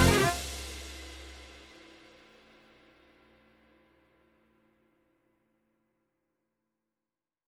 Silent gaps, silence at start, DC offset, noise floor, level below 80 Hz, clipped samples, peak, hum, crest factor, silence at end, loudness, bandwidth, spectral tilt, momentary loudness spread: none; 0 s; under 0.1%; under -90 dBFS; -48 dBFS; under 0.1%; -10 dBFS; none; 26 dB; 5.9 s; -32 LUFS; 16.5 kHz; -4.5 dB/octave; 28 LU